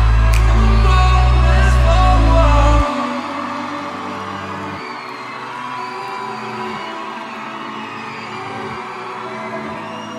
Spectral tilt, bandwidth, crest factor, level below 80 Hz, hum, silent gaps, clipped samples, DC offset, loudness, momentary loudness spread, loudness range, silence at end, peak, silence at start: -6 dB/octave; 10 kHz; 14 dB; -18 dBFS; none; none; under 0.1%; under 0.1%; -18 LUFS; 14 LU; 12 LU; 0 s; -2 dBFS; 0 s